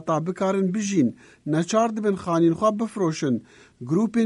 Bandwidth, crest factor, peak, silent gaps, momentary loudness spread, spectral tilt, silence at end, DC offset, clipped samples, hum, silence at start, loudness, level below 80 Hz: 11.5 kHz; 16 dB; -8 dBFS; none; 6 LU; -6.5 dB/octave; 0 s; under 0.1%; under 0.1%; none; 0 s; -23 LUFS; -62 dBFS